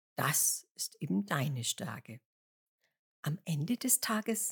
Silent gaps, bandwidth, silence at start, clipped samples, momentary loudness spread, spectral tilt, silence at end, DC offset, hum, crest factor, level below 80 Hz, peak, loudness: 0.71-0.75 s, 2.25-2.79 s, 2.99-3.23 s; 19.5 kHz; 0.2 s; under 0.1%; 13 LU; -3.5 dB/octave; 0 s; under 0.1%; none; 22 dB; -88 dBFS; -12 dBFS; -33 LUFS